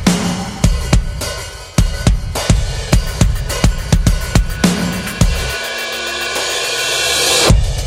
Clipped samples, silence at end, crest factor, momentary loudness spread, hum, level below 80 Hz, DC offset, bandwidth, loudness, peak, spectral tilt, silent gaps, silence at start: under 0.1%; 0 s; 14 dB; 7 LU; none; -18 dBFS; under 0.1%; 16.5 kHz; -16 LUFS; 0 dBFS; -4 dB/octave; none; 0 s